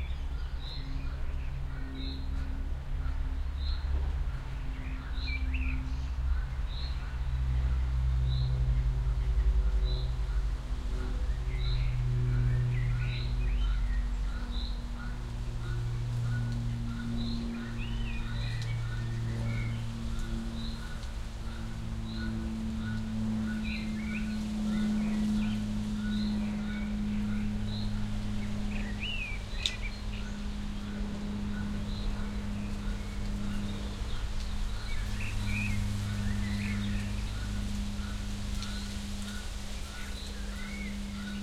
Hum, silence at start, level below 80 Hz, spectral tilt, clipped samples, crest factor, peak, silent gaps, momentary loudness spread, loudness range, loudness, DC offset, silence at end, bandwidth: none; 0 s; -34 dBFS; -6 dB/octave; under 0.1%; 20 dB; -10 dBFS; none; 8 LU; 5 LU; -35 LUFS; under 0.1%; 0 s; 13 kHz